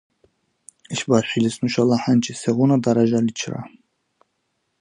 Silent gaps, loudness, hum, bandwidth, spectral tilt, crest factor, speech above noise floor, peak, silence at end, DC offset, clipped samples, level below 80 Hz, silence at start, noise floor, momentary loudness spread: none; -20 LUFS; none; 11 kHz; -6 dB/octave; 20 dB; 53 dB; -2 dBFS; 1.15 s; under 0.1%; under 0.1%; -62 dBFS; 0.9 s; -73 dBFS; 12 LU